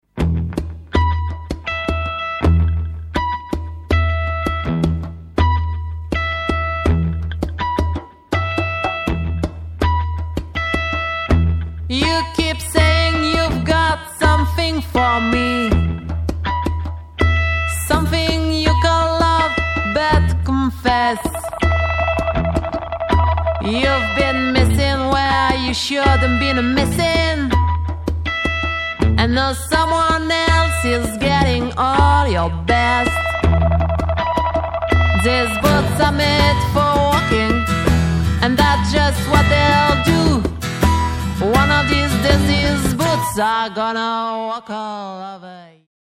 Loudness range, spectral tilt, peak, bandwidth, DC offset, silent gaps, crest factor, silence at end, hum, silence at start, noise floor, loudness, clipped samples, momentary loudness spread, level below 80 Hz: 5 LU; -5.5 dB/octave; 0 dBFS; 16 kHz; under 0.1%; none; 16 dB; 0.4 s; none; 0.15 s; -38 dBFS; -17 LUFS; under 0.1%; 9 LU; -24 dBFS